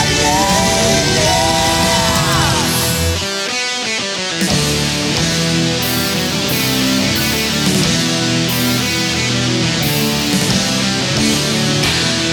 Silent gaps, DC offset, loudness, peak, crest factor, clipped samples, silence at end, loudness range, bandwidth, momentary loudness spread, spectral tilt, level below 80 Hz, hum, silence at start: none; under 0.1%; -14 LUFS; 0 dBFS; 14 dB; under 0.1%; 0 s; 2 LU; over 20 kHz; 4 LU; -3 dB/octave; -34 dBFS; none; 0 s